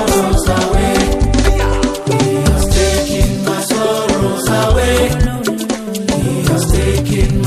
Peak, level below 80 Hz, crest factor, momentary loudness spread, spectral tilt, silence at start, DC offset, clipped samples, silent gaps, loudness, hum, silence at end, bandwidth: 0 dBFS; -18 dBFS; 12 dB; 4 LU; -5 dB/octave; 0 s; under 0.1%; under 0.1%; none; -14 LUFS; none; 0 s; 15 kHz